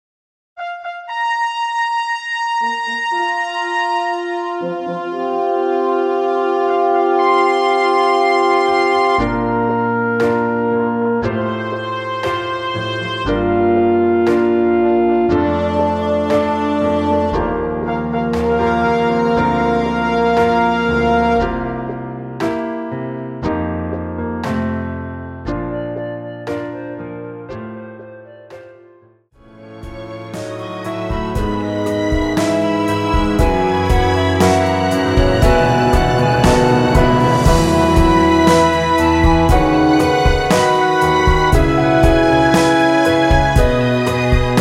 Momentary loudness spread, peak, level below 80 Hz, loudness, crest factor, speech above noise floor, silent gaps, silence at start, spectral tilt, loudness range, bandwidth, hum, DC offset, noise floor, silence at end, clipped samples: 13 LU; 0 dBFS; -26 dBFS; -16 LUFS; 14 dB; 29 dB; none; 0.55 s; -6 dB/octave; 12 LU; 16 kHz; none; under 0.1%; -49 dBFS; 0 s; under 0.1%